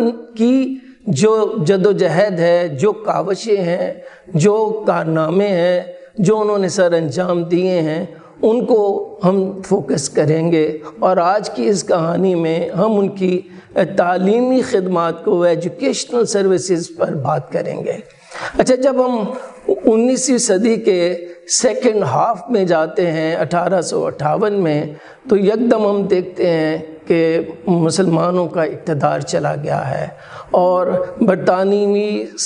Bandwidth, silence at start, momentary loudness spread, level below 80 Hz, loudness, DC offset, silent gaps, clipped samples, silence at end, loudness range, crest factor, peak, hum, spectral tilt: 11.5 kHz; 0 s; 7 LU; -56 dBFS; -16 LUFS; under 0.1%; none; under 0.1%; 0 s; 2 LU; 16 dB; 0 dBFS; none; -5.5 dB/octave